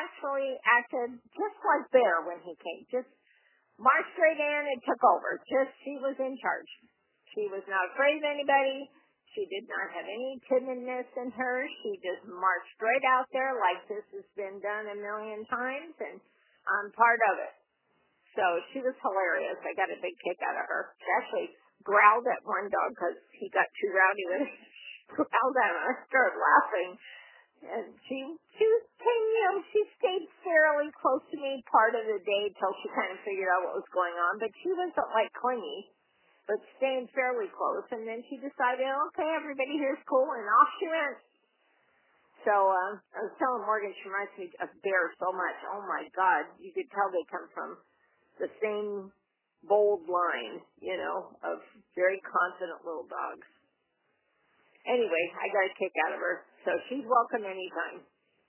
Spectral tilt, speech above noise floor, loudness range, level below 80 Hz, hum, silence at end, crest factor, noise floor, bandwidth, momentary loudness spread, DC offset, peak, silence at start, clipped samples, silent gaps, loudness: -0.5 dB/octave; 46 dB; 5 LU; -86 dBFS; none; 0.5 s; 24 dB; -76 dBFS; 3.2 kHz; 15 LU; under 0.1%; -6 dBFS; 0 s; under 0.1%; none; -30 LUFS